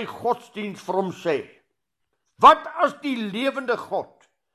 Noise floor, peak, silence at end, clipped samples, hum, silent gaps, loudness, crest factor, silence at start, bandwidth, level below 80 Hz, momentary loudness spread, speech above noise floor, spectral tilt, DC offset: -79 dBFS; -2 dBFS; 0.5 s; under 0.1%; none; none; -22 LUFS; 22 dB; 0 s; 13.5 kHz; -64 dBFS; 16 LU; 57 dB; -5 dB/octave; under 0.1%